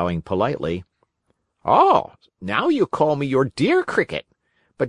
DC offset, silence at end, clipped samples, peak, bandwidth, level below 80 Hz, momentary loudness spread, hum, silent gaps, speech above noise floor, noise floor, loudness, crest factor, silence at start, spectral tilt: under 0.1%; 0 s; under 0.1%; -2 dBFS; 11 kHz; -56 dBFS; 15 LU; none; none; 51 dB; -70 dBFS; -20 LUFS; 20 dB; 0 s; -6.5 dB/octave